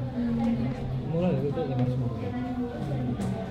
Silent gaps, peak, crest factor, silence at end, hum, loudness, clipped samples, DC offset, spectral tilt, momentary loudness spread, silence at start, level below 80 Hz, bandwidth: none; -14 dBFS; 14 dB; 0 s; none; -29 LUFS; under 0.1%; under 0.1%; -9 dB/octave; 5 LU; 0 s; -46 dBFS; 9.8 kHz